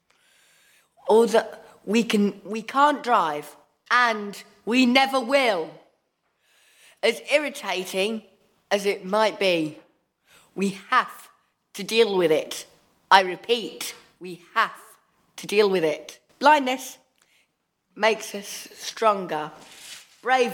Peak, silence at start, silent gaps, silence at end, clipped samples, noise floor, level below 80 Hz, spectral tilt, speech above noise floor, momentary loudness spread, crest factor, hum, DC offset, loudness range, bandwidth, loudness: 0 dBFS; 1.05 s; none; 0 s; under 0.1%; -73 dBFS; -78 dBFS; -3.5 dB/octave; 50 dB; 18 LU; 24 dB; none; under 0.1%; 4 LU; 18.5 kHz; -23 LUFS